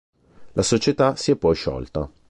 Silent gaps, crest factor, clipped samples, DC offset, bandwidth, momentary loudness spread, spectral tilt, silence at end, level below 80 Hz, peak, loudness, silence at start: none; 16 dB; under 0.1%; under 0.1%; 11.5 kHz; 10 LU; -5 dB/octave; 0.2 s; -42 dBFS; -6 dBFS; -21 LUFS; 0.4 s